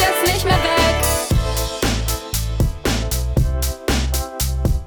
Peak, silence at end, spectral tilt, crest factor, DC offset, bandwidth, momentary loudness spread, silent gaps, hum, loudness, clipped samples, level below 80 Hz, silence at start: -2 dBFS; 0 s; -4 dB/octave; 16 dB; under 0.1%; over 20 kHz; 7 LU; none; none; -19 LUFS; under 0.1%; -24 dBFS; 0 s